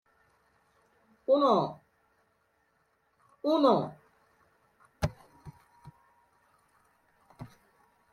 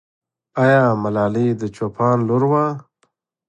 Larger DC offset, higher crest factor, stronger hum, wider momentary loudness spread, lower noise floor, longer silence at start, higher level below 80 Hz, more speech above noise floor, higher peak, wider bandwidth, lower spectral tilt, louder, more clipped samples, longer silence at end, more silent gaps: neither; first, 22 dB vs 16 dB; neither; first, 28 LU vs 10 LU; first, -73 dBFS vs -66 dBFS; first, 1.3 s vs 0.55 s; about the same, -58 dBFS vs -56 dBFS; about the same, 48 dB vs 49 dB; second, -12 dBFS vs -2 dBFS; first, 12.5 kHz vs 8.6 kHz; second, -7 dB/octave vs -8.5 dB/octave; second, -28 LUFS vs -18 LUFS; neither; about the same, 0.65 s vs 0.7 s; neither